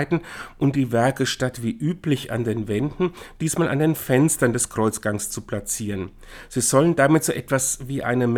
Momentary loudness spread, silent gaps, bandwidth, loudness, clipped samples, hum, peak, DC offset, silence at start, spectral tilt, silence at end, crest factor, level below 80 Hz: 10 LU; none; 19.5 kHz; -22 LUFS; under 0.1%; none; -4 dBFS; under 0.1%; 0 s; -5 dB/octave; 0 s; 18 dB; -48 dBFS